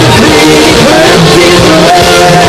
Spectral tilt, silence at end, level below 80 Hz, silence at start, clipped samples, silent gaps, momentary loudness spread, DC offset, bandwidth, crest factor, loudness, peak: -4 dB/octave; 0 s; -24 dBFS; 0 s; 10%; none; 0 LU; under 0.1%; over 20 kHz; 2 dB; -2 LUFS; 0 dBFS